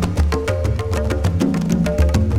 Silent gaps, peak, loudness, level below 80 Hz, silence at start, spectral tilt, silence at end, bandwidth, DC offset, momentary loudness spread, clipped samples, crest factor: none; -4 dBFS; -19 LUFS; -22 dBFS; 0 s; -7 dB/octave; 0 s; 15 kHz; under 0.1%; 4 LU; under 0.1%; 14 dB